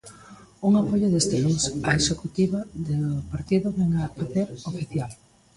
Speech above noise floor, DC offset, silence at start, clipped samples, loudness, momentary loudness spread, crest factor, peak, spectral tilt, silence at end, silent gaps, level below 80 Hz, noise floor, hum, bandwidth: 24 dB; under 0.1%; 0.05 s; under 0.1%; -25 LUFS; 9 LU; 18 dB; -6 dBFS; -5 dB/octave; 0.4 s; none; -48 dBFS; -48 dBFS; none; 11.5 kHz